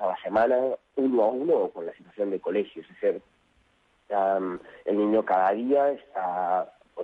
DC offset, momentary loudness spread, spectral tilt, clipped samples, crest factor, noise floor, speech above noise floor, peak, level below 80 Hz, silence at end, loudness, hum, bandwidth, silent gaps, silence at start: under 0.1%; 11 LU; -8 dB/octave; under 0.1%; 14 dB; -66 dBFS; 40 dB; -12 dBFS; -70 dBFS; 0 s; -26 LUFS; none; 5 kHz; none; 0 s